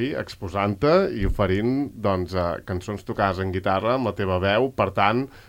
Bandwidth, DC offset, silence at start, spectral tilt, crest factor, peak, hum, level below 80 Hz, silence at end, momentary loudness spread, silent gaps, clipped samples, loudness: 16.5 kHz; under 0.1%; 0 s; -7 dB/octave; 18 dB; -4 dBFS; none; -40 dBFS; 0.05 s; 10 LU; none; under 0.1%; -23 LUFS